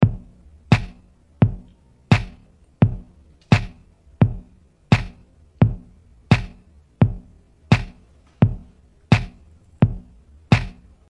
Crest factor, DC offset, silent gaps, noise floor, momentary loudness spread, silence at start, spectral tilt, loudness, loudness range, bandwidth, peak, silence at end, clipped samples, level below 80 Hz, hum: 20 dB; under 0.1%; none; -52 dBFS; 18 LU; 0 s; -7.5 dB/octave; -21 LUFS; 1 LU; 10.5 kHz; -2 dBFS; 0.35 s; under 0.1%; -36 dBFS; none